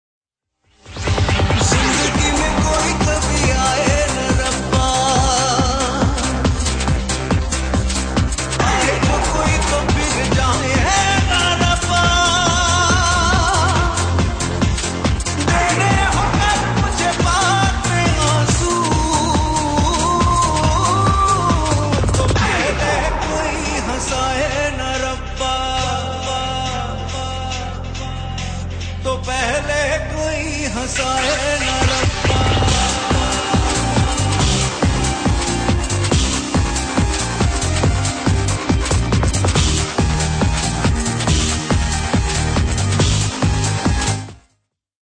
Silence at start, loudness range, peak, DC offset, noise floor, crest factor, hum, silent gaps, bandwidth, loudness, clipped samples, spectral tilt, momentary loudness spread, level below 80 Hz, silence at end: 0.85 s; 5 LU; -2 dBFS; under 0.1%; -67 dBFS; 14 dB; none; none; 10 kHz; -17 LUFS; under 0.1%; -4 dB/octave; 6 LU; -24 dBFS; 0.8 s